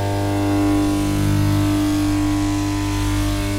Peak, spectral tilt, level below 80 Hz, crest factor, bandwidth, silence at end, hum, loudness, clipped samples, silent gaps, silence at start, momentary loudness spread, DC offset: -8 dBFS; -6 dB/octave; -28 dBFS; 10 dB; 16 kHz; 0 s; 50 Hz at -25 dBFS; -19 LUFS; under 0.1%; none; 0 s; 3 LU; under 0.1%